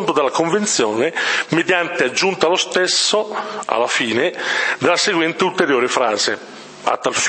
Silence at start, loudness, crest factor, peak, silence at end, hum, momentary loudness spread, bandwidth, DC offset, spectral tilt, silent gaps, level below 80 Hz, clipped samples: 0 s; -17 LUFS; 18 dB; 0 dBFS; 0 s; none; 5 LU; 8.8 kHz; under 0.1%; -2.5 dB/octave; none; -66 dBFS; under 0.1%